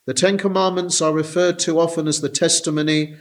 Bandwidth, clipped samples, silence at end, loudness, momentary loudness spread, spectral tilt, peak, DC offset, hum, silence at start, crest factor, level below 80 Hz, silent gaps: 13.5 kHz; under 0.1%; 0.05 s; -18 LUFS; 3 LU; -3.5 dB/octave; -2 dBFS; under 0.1%; none; 0.05 s; 16 dB; -68 dBFS; none